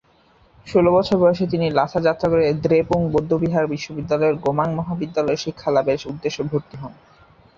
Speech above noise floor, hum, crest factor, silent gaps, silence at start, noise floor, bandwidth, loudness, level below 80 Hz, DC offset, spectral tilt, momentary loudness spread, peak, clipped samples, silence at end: 36 dB; none; 18 dB; none; 0.65 s; -55 dBFS; 7.4 kHz; -20 LUFS; -48 dBFS; under 0.1%; -7 dB/octave; 9 LU; -2 dBFS; under 0.1%; 0.65 s